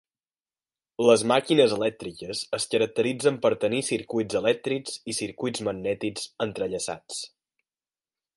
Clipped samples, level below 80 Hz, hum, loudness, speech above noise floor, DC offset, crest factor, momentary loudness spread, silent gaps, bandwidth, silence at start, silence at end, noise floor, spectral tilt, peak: under 0.1%; -64 dBFS; none; -26 LUFS; over 65 dB; under 0.1%; 22 dB; 12 LU; none; 11.5 kHz; 1 s; 1.1 s; under -90 dBFS; -4 dB/octave; -6 dBFS